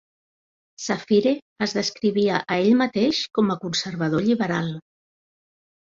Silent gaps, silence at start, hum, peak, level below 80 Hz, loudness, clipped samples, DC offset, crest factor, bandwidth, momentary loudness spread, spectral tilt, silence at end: 1.42-1.56 s; 0.8 s; none; -6 dBFS; -62 dBFS; -22 LUFS; under 0.1%; under 0.1%; 18 dB; 7.6 kHz; 9 LU; -5 dB/octave; 1.15 s